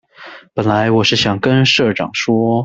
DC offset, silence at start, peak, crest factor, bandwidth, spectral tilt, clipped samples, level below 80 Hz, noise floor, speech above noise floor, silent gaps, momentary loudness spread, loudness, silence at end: under 0.1%; 0.2 s; 0 dBFS; 14 dB; 8 kHz; -5 dB/octave; under 0.1%; -50 dBFS; -38 dBFS; 24 dB; none; 7 LU; -14 LUFS; 0 s